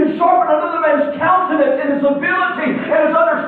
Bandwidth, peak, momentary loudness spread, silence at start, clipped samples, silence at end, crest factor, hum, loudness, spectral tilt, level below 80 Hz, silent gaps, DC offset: 4.3 kHz; -2 dBFS; 3 LU; 0 s; under 0.1%; 0 s; 12 dB; none; -15 LUFS; -9 dB/octave; -62 dBFS; none; under 0.1%